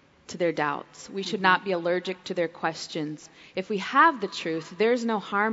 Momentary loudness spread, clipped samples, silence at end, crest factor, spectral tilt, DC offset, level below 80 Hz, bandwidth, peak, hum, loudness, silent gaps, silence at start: 15 LU; under 0.1%; 0 s; 22 dB; -4.5 dB/octave; under 0.1%; -72 dBFS; 8 kHz; -6 dBFS; none; -26 LUFS; none; 0.3 s